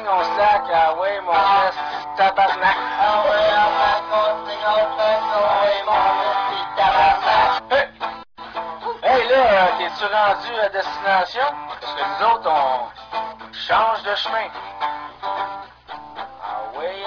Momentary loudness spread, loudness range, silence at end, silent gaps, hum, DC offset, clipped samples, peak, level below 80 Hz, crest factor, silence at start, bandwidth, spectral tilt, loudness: 14 LU; 5 LU; 0 s; none; none; under 0.1%; under 0.1%; -4 dBFS; -52 dBFS; 16 dB; 0 s; 5.4 kHz; -3.5 dB/octave; -19 LUFS